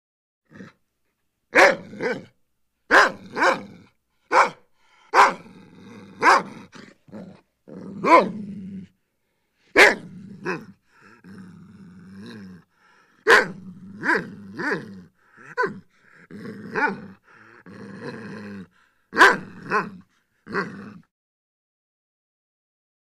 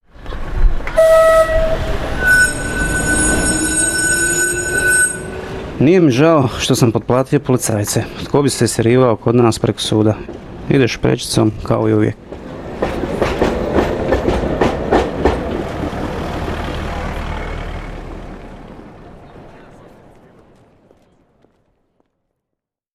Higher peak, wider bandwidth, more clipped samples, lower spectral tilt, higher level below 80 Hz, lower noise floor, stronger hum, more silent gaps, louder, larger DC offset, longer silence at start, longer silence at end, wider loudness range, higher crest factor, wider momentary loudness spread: about the same, 0 dBFS vs -2 dBFS; about the same, 15 kHz vs 16 kHz; neither; about the same, -3.5 dB/octave vs -4.5 dB/octave; second, -64 dBFS vs -28 dBFS; second, -74 dBFS vs -80 dBFS; neither; neither; second, -20 LUFS vs -15 LUFS; neither; first, 0.6 s vs 0.2 s; second, 2.2 s vs 3.3 s; about the same, 10 LU vs 12 LU; first, 24 dB vs 14 dB; first, 26 LU vs 16 LU